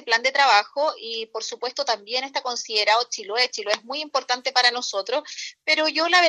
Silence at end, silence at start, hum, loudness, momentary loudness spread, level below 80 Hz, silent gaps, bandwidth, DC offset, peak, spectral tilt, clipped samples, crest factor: 0 s; 0.05 s; none; -22 LUFS; 11 LU; -84 dBFS; none; 10.5 kHz; under 0.1%; -4 dBFS; 1 dB/octave; under 0.1%; 20 dB